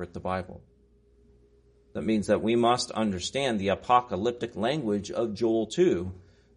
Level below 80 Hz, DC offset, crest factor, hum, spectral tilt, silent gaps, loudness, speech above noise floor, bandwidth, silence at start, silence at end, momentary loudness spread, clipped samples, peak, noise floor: -58 dBFS; under 0.1%; 20 dB; none; -5 dB/octave; none; -27 LUFS; 34 dB; 10.5 kHz; 0 s; 0.35 s; 9 LU; under 0.1%; -8 dBFS; -61 dBFS